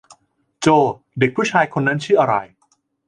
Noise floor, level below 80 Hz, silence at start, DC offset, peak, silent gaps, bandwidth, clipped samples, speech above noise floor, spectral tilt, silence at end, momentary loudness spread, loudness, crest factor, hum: -64 dBFS; -60 dBFS; 0.6 s; under 0.1%; 0 dBFS; none; 11 kHz; under 0.1%; 47 dB; -5.5 dB/octave; 0.65 s; 5 LU; -18 LUFS; 18 dB; none